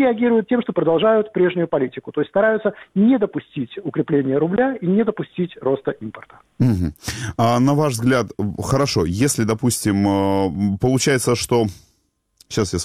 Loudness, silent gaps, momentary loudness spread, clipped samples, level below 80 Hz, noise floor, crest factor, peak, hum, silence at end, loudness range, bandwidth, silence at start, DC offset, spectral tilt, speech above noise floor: -19 LUFS; none; 9 LU; under 0.1%; -46 dBFS; -66 dBFS; 14 dB; -4 dBFS; none; 0 s; 3 LU; 16 kHz; 0 s; under 0.1%; -5.5 dB/octave; 47 dB